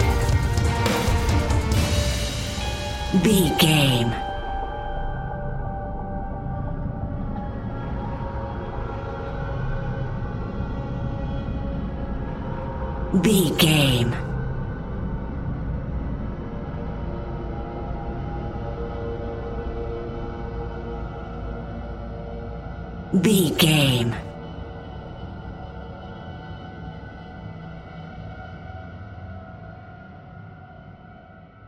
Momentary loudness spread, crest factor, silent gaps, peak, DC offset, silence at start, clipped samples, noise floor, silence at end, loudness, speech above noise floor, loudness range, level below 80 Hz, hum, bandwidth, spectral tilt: 20 LU; 22 dB; none; -4 dBFS; under 0.1%; 0 s; under 0.1%; -45 dBFS; 0 s; -25 LUFS; 27 dB; 16 LU; -32 dBFS; none; 16 kHz; -5 dB/octave